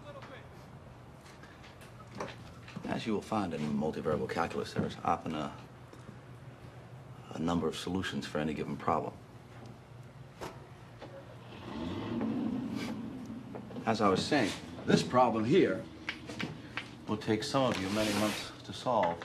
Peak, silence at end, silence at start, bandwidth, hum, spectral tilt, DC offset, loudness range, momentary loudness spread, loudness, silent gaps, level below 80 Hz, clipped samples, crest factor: -12 dBFS; 0 s; 0 s; 14.5 kHz; none; -5.5 dB/octave; under 0.1%; 10 LU; 22 LU; -34 LUFS; none; -58 dBFS; under 0.1%; 24 dB